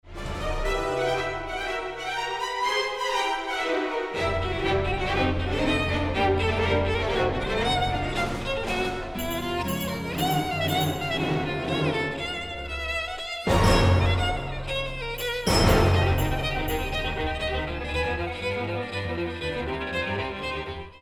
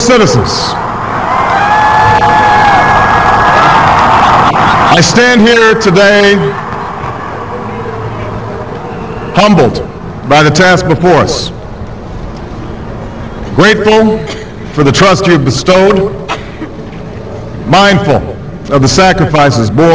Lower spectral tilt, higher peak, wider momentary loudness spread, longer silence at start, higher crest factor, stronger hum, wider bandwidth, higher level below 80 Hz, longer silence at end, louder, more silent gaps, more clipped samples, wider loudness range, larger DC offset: about the same, -5 dB/octave vs -5 dB/octave; second, -6 dBFS vs 0 dBFS; second, 8 LU vs 17 LU; about the same, 0.05 s vs 0 s; first, 20 dB vs 8 dB; neither; first, over 20 kHz vs 8 kHz; second, -36 dBFS vs -28 dBFS; about the same, 0.05 s vs 0 s; second, -26 LUFS vs -7 LUFS; neither; neither; second, 4 LU vs 7 LU; second, under 0.1% vs 2%